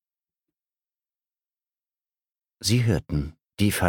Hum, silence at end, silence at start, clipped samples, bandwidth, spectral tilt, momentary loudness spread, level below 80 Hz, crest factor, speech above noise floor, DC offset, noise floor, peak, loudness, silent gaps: none; 0 s; 2.6 s; under 0.1%; 18 kHz; -5 dB/octave; 8 LU; -44 dBFS; 24 dB; over 67 dB; under 0.1%; under -90 dBFS; -4 dBFS; -25 LUFS; none